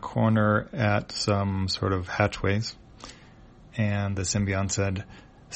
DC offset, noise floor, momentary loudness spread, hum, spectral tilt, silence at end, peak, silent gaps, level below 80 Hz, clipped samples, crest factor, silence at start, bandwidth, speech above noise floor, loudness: under 0.1%; -51 dBFS; 17 LU; none; -5 dB/octave; 0 s; -8 dBFS; none; -50 dBFS; under 0.1%; 18 dB; 0 s; 8.4 kHz; 25 dB; -26 LUFS